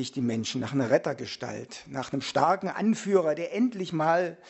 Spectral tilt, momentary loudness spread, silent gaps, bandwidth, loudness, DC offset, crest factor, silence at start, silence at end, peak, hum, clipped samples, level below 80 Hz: -5.5 dB/octave; 11 LU; none; 8.2 kHz; -28 LUFS; under 0.1%; 20 dB; 0 s; 0 s; -8 dBFS; none; under 0.1%; -70 dBFS